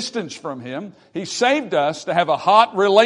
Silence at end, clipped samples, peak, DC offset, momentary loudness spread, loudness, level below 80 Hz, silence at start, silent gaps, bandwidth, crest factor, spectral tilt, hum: 0 s; under 0.1%; 0 dBFS; under 0.1%; 16 LU; -18 LUFS; -70 dBFS; 0 s; none; 11 kHz; 18 dB; -3.5 dB/octave; none